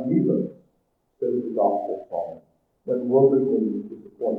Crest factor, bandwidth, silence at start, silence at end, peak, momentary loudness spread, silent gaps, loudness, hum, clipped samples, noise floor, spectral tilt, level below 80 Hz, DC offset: 18 dB; 2.2 kHz; 0 s; 0 s; -6 dBFS; 15 LU; none; -24 LUFS; none; under 0.1%; -70 dBFS; -12.5 dB/octave; -72 dBFS; under 0.1%